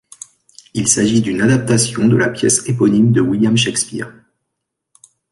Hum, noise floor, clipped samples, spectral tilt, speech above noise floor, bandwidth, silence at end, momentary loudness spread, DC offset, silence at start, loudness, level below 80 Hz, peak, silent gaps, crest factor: none; -77 dBFS; under 0.1%; -4.5 dB/octave; 63 dB; 11.5 kHz; 1.2 s; 14 LU; under 0.1%; 0.75 s; -14 LUFS; -50 dBFS; 0 dBFS; none; 16 dB